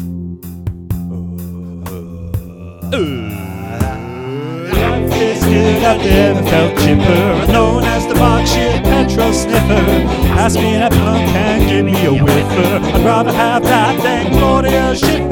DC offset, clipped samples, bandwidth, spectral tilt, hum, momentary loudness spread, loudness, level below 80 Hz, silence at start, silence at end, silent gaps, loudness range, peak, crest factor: under 0.1%; 0.1%; 18.5 kHz; -6 dB/octave; none; 14 LU; -13 LUFS; -22 dBFS; 0 s; 0 s; none; 11 LU; 0 dBFS; 12 dB